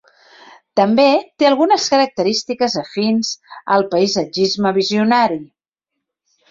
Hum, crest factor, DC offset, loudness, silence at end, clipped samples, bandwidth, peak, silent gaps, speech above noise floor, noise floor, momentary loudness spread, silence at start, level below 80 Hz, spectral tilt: none; 16 dB; under 0.1%; -16 LUFS; 1.05 s; under 0.1%; 7.6 kHz; -2 dBFS; none; 64 dB; -79 dBFS; 6 LU; 0.75 s; -60 dBFS; -4 dB/octave